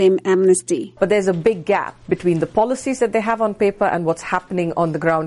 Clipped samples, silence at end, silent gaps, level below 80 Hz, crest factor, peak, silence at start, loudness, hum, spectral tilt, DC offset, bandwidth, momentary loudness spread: under 0.1%; 0 s; none; -52 dBFS; 14 dB; -4 dBFS; 0 s; -19 LUFS; none; -5.5 dB/octave; under 0.1%; 11.5 kHz; 6 LU